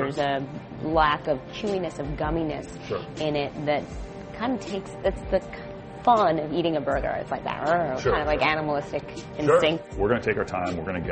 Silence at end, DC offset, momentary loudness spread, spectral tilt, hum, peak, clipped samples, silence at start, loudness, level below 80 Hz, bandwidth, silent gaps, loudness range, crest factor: 0 s; under 0.1%; 12 LU; -6 dB/octave; none; -6 dBFS; under 0.1%; 0 s; -26 LUFS; -42 dBFS; 8.4 kHz; none; 5 LU; 20 dB